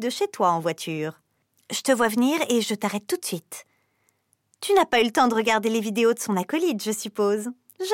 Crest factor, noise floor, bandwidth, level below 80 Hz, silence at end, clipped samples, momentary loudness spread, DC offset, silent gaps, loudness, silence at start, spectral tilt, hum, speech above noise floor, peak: 16 dB; -69 dBFS; 17 kHz; -68 dBFS; 0 s; under 0.1%; 12 LU; under 0.1%; none; -24 LUFS; 0 s; -3.5 dB/octave; none; 46 dB; -8 dBFS